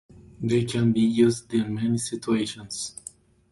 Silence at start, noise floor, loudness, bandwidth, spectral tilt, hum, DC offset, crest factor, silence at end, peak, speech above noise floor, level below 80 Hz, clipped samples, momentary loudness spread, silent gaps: 0.2 s; -47 dBFS; -25 LUFS; 11.5 kHz; -5.5 dB/octave; none; under 0.1%; 18 dB; 0.6 s; -8 dBFS; 24 dB; -56 dBFS; under 0.1%; 12 LU; none